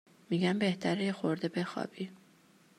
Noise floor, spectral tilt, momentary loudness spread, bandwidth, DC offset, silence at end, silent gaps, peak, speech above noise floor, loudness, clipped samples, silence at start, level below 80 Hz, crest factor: -63 dBFS; -6.5 dB/octave; 11 LU; 11.5 kHz; under 0.1%; 0.6 s; none; -18 dBFS; 31 dB; -33 LUFS; under 0.1%; 0.3 s; -78 dBFS; 16 dB